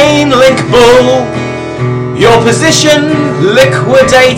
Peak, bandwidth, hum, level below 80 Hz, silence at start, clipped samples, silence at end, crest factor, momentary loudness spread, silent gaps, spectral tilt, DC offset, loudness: 0 dBFS; 16.5 kHz; none; -34 dBFS; 0 s; 1%; 0 s; 6 dB; 10 LU; none; -4.5 dB/octave; under 0.1%; -7 LUFS